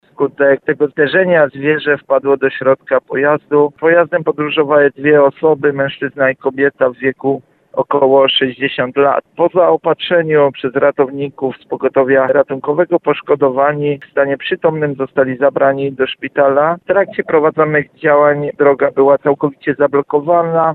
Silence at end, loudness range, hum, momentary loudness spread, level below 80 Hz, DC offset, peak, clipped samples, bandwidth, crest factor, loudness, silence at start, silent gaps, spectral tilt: 0 s; 2 LU; none; 6 LU; -58 dBFS; under 0.1%; 0 dBFS; under 0.1%; 4.3 kHz; 12 dB; -13 LUFS; 0.2 s; none; -9 dB/octave